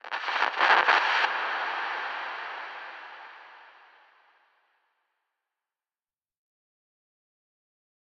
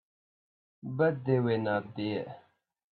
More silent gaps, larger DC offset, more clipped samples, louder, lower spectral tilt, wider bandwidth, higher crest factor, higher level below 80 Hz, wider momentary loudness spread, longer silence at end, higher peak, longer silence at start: neither; neither; neither; first, -26 LUFS vs -31 LUFS; second, 0 dB/octave vs -10.5 dB/octave; first, 8.6 kHz vs 4.6 kHz; about the same, 24 dB vs 20 dB; second, under -90 dBFS vs -74 dBFS; first, 22 LU vs 14 LU; first, 4.4 s vs 0.6 s; first, -8 dBFS vs -14 dBFS; second, 0.05 s vs 0.85 s